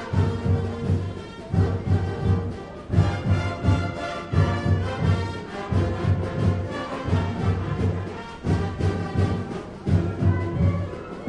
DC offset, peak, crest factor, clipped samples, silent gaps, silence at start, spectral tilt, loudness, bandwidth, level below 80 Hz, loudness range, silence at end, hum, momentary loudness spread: under 0.1%; -6 dBFS; 16 dB; under 0.1%; none; 0 s; -8 dB/octave; -25 LUFS; 9 kHz; -40 dBFS; 2 LU; 0 s; none; 8 LU